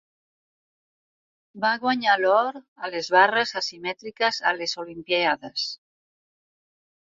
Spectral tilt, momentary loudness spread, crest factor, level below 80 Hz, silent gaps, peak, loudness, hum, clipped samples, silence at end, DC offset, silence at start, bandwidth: -2.5 dB/octave; 13 LU; 22 dB; -72 dBFS; 2.68-2.76 s; -4 dBFS; -23 LUFS; none; under 0.1%; 1.45 s; under 0.1%; 1.55 s; 7.8 kHz